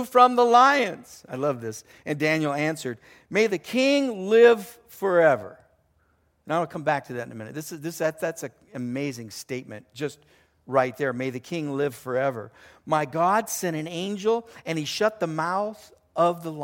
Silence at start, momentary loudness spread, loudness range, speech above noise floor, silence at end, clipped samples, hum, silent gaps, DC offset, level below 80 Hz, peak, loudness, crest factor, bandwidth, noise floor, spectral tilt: 0 s; 18 LU; 8 LU; 42 dB; 0 s; under 0.1%; none; none; under 0.1%; -70 dBFS; -4 dBFS; -24 LUFS; 22 dB; 17 kHz; -66 dBFS; -4.5 dB/octave